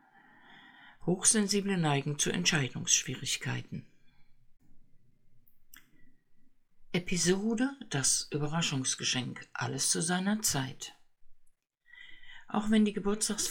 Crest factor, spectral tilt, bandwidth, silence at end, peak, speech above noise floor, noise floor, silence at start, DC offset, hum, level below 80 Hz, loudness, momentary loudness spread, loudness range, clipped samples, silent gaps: 22 dB; -3 dB/octave; 19 kHz; 0 s; -12 dBFS; 31 dB; -61 dBFS; 0.5 s; under 0.1%; none; -56 dBFS; -30 LUFS; 12 LU; 8 LU; under 0.1%; none